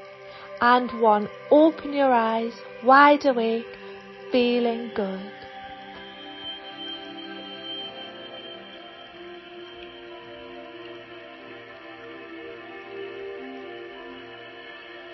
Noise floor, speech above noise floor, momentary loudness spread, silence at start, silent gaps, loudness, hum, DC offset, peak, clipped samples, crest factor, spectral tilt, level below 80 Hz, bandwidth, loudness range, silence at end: -43 dBFS; 22 dB; 22 LU; 0 s; none; -22 LUFS; none; under 0.1%; -2 dBFS; under 0.1%; 24 dB; -6 dB/octave; -66 dBFS; 6 kHz; 20 LU; 0 s